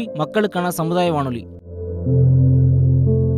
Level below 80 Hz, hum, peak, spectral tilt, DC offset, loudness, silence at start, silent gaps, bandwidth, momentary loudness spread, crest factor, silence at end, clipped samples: -36 dBFS; none; -6 dBFS; -8 dB/octave; under 0.1%; -17 LUFS; 0 s; none; 13.5 kHz; 15 LU; 12 dB; 0 s; under 0.1%